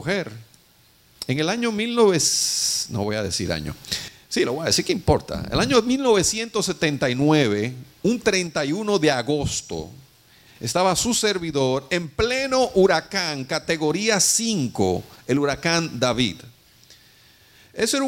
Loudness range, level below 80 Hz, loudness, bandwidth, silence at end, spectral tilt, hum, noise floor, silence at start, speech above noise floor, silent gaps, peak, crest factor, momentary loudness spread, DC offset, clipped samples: 3 LU; -46 dBFS; -21 LUFS; 16.5 kHz; 0 s; -3.5 dB/octave; none; -56 dBFS; 0 s; 34 dB; none; -2 dBFS; 20 dB; 10 LU; under 0.1%; under 0.1%